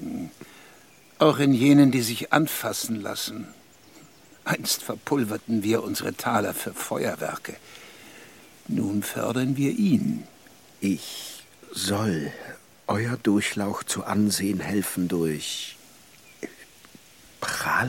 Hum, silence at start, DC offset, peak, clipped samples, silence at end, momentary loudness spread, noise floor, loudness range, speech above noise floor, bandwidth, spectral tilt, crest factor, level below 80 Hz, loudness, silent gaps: none; 0 s; under 0.1%; -4 dBFS; under 0.1%; 0 s; 20 LU; -53 dBFS; 7 LU; 29 dB; 17 kHz; -4.5 dB/octave; 22 dB; -64 dBFS; -25 LUFS; none